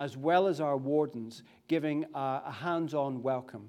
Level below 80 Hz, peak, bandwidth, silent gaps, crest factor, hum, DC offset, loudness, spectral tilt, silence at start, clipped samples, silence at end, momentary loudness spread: -82 dBFS; -14 dBFS; 13.5 kHz; none; 18 dB; none; under 0.1%; -32 LUFS; -7 dB/octave; 0 s; under 0.1%; 0 s; 9 LU